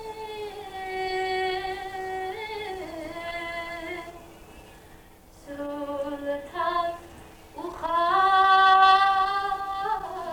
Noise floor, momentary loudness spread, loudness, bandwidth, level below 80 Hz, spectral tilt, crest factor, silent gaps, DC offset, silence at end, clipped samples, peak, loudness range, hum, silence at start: -51 dBFS; 19 LU; -25 LUFS; 19 kHz; -54 dBFS; -3.5 dB/octave; 20 dB; none; under 0.1%; 0 s; under 0.1%; -6 dBFS; 14 LU; none; 0 s